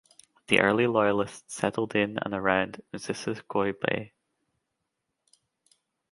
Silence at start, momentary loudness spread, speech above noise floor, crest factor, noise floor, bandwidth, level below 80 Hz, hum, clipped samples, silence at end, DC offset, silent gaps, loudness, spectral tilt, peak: 0.5 s; 12 LU; 55 dB; 26 dB; -82 dBFS; 11.5 kHz; -64 dBFS; none; under 0.1%; 2.05 s; under 0.1%; none; -27 LUFS; -5 dB/octave; -4 dBFS